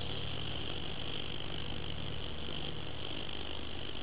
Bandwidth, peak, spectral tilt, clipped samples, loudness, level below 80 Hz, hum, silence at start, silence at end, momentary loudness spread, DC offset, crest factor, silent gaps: 4 kHz; -24 dBFS; -3 dB/octave; under 0.1%; -40 LUFS; -50 dBFS; none; 0 s; 0 s; 2 LU; 1%; 16 dB; none